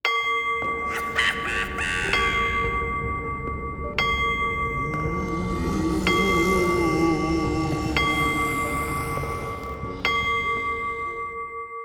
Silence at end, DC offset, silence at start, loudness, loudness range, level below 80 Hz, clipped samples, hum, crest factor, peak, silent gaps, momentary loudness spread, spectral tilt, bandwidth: 0 s; under 0.1%; 0.05 s; -24 LUFS; 3 LU; -38 dBFS; under 0.1%; none; 18 dB; -6 dBFS; none; 9 LU; -5 dB/octave; over 20 kHz